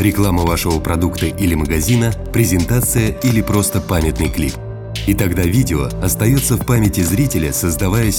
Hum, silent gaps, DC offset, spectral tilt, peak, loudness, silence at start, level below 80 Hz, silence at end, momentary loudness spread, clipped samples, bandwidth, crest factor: none; none; under 0.1%; -5.5 dB/octave; 0 dBFS; -16 LUFS; 0 s; -26 dBFS; 0 s; 4 LU; under 0.1%; 18.5 kHz; 14 dB